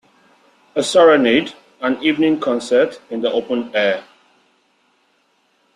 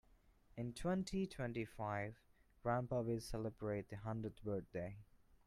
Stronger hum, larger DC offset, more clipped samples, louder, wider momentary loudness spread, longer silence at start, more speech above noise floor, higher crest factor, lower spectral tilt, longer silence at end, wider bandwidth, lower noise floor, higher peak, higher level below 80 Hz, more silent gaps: neither; neither; neither; first, -17 LUFS vs -44 LUFS; first, 12 LU vs 8 LU; first, 0.75 s vs 0.55 s; first, 46 dB vs 27 dB; about the same, 16 dB vs 18 dB; second, -4 dB/octave vs -7 dB/octave; first, 1.75 s vs 0.1 s; second, 11.5 kHz vs 14 kHz; second, -62 dBFS vs -70 dBFS; first, -2 dBFS vs -28 dBFS; about the same, -62 dBFS vs -62 dBFS; neither